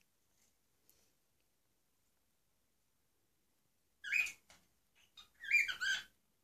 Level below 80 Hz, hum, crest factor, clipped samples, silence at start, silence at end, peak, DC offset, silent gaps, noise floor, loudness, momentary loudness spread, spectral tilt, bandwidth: -84 dBFS; none; 22 dB; under 0.1%; 4.05 s; 0.4 s; -22 dBFS; under 0.1%; none; -82 dBFS; -35 LUFS; 15 LU; 2.5 dB/octave; 14.5 kHz